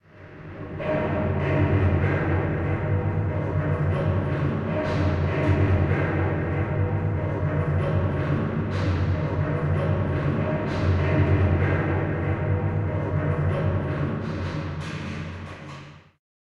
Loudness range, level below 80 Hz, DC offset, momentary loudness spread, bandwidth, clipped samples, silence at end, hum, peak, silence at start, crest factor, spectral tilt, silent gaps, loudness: 3 LU; -40 dBFS; under 0.1%; 10 LU; 6.6 kHz; under 0.1%; 0.55 s; none; -10 dBFS; 0.15 s; 14 dB; -9 dB/octave; none; -25 LUFS